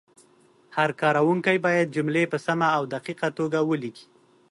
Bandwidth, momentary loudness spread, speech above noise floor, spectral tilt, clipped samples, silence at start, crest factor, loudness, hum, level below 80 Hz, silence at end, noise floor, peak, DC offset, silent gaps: 11.5 kHz; 8 LU; 35 dB; -6 dB/octave; under 0.1%; 0.7 s; 16 dB; -24 LUFS; none; -72 dBFS; 0.5 s; -59 dBFS; -8 dBFS; under 0.1%; none